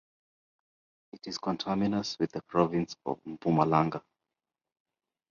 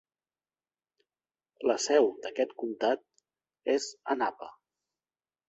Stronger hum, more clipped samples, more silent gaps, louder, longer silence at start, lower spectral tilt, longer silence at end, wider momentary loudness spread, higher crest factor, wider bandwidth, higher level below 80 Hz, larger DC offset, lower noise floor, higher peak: neither; neither; neither; about the same, -30 LUFS vs -30 LUFS; second, 1.15 s vs 1.6 s; first, -6.5 dB/octave vs -2 dB/octave; first, 1.3 s vs 0.95 s; about the same, 11 LU vs 10 LU; about the same, 24 dB vs 20 dB; second, 7.2 kHz vs 8.2 kHz; first, -64 dBFS vs -78 dBFS; neither; about the same, -90 dBFS vs under -90 dBFS; about the same, -10 dBFS vs -12 dBFS